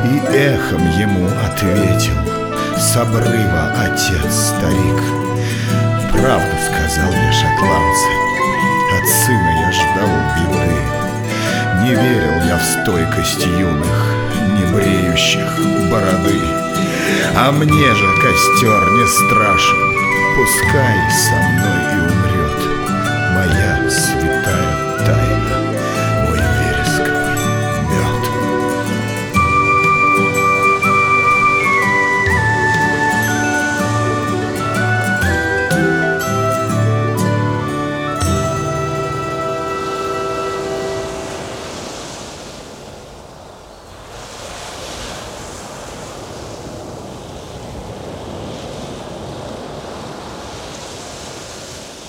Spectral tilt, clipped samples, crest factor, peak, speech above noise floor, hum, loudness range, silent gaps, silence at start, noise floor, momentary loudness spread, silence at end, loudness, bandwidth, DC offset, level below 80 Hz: -4.5 dB/octave; under 0.1%; 16 dB; 0 dBFS; 23 dB; none; 17 LU; none; 0 s; -37 dBFS; 18 LU; 0 s; -14 LUFS; 20 kHz; under 0.1%; -32 dBFS